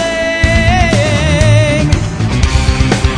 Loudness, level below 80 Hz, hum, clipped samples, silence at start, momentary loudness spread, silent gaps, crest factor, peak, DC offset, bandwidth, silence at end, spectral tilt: -11 LUFS; -16 dBFS; none; 0.2%; 0 s; 5 LU; none; 10 dB; 0 dBFS; under 0.1%; 10.5 kHz; 0 s; -5.5 dB/octave